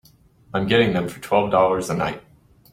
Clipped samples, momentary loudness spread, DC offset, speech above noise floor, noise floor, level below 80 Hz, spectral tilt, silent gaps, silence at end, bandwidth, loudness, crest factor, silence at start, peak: under 0.1%; 10 LU; under 0.1%; 33 dB; -53 dBFS; -52 dBFS; -5.5 dB/octave; none; 0.55 s; 16 kHz; -21 LUFS; 20 dB; 0.55 s; -2 dBFS